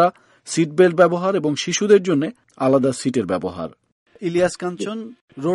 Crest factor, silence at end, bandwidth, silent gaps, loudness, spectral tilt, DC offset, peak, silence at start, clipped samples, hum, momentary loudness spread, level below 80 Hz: 18 dB; 0 s; 11.5 kHz; 3.92-4.06 s, 5.21-5.28 s; -19 LUFS; -5 dB/octave; under 0.1%; -2 dBFS; 0 s; under 0.1%; none; 13 LU; -60 dBFS